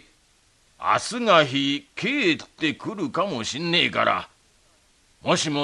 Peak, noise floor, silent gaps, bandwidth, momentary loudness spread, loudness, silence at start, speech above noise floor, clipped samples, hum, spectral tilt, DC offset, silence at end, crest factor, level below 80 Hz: -4 dBFS; -61 dBFS; none; 11.5 kHz; 10 LU; -23 LUFS; 0.8 s; 38 dB; under 0.1%; none; -3.5 dB/octave; under 0.1%; 0 s; 22 dB; -64 dBFS